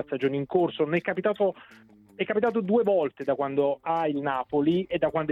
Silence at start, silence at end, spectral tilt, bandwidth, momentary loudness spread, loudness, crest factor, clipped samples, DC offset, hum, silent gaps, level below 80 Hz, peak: 0 s; 0 s; -8.5 dB/octave; 5.6 kHz; 5 LU; -26 LUFS; 14 dB; under 0.1%; under 0.1%; none; none; -64 dBFS; -12 dBFS